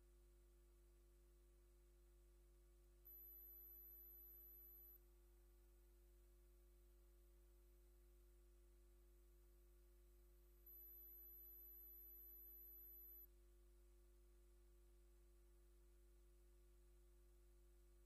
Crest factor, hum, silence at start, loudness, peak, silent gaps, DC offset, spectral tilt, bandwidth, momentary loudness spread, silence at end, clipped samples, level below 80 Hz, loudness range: 12 dB; 50 Hz at -70 dBFS; 0 s; -61 LUFS; -54 dBFS; none; under 0.1%; -5.5 dB/octave; 15 kHz; 5 LU; 0 s; under 0.1%; -72 dBFS; 7 LU